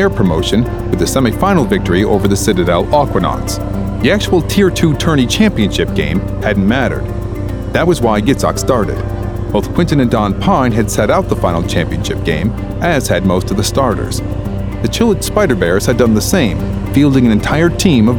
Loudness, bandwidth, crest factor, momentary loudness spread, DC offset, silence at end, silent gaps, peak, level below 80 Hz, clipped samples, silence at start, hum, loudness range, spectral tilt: -13 LUFS; 19 kHz; 12 dB; 7 LU; 0.1%; 0 s; none; 0 dBFS; -24 dBFS; under 0.1%; 0 s; none; 2 LU; -5.5 dB/octave